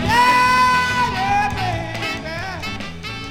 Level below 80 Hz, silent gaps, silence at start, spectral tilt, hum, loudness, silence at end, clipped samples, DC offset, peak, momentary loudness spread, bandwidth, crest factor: -38 dBFS; none; 0 s; -4 dB/octave; none; -18 LUFS; 0 s; under 0.1%; under 0.1%; -4 dBFS; 14 LU; 17 kHz; 14 dB